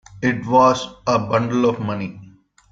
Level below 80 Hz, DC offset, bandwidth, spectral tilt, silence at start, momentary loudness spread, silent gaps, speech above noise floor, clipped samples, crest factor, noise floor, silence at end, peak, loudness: -54 dBFS; under 0.1%; 7.8 kHz; -6 dB/octave; 0.15 s; 11 LU; none; 29 dB; under 0.1%; 18 dB; -47 dBFS; 0.45 s; -2 dBFS; -19 LUFS